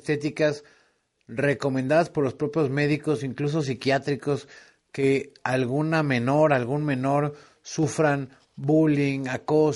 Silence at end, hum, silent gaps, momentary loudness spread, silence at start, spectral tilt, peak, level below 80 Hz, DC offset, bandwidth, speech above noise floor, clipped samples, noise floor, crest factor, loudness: 0 s; none; none; 9 LU; 0.05 s; -6.5 dB/octave; -6 dBFS; -64 dBFS; under 0.1%; 11.5 kHz; 42 dB; under 0.1%; -66 dBFS; 18 dB; -25 LUFS